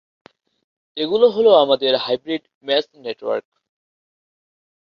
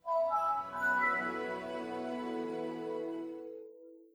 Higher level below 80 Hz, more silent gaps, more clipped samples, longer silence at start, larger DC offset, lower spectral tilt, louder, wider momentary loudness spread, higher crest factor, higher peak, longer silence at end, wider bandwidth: first, -68 dBFS vs -74 dBFS; first, 2.55-2.61 s vs none; neither; first, 0.95 s vs 0.05 s; neither; about the same, -6 dB/octave vs -5.5 dB/octave; first, -18 LUFS vs -35 LUFS; about the same, 15 LU vs 14 LU; about the same, 18 dB vs 16 dB; first, -2 dBFS vs -20 dBFS; first, 1.55 s vs 0.1 s; second, 6.2 kHz vs over 20 kHz